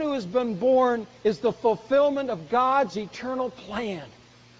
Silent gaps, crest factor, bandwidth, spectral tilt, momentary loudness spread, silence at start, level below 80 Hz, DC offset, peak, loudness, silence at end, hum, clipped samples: none; 14 dB; 7.8 kHz; -6 dB/octave; 10 LU; 0 s; -62 dBFS; under 0.1%; -10 dBFS; -25 LUFS; 0.5 s; none; under 0.1%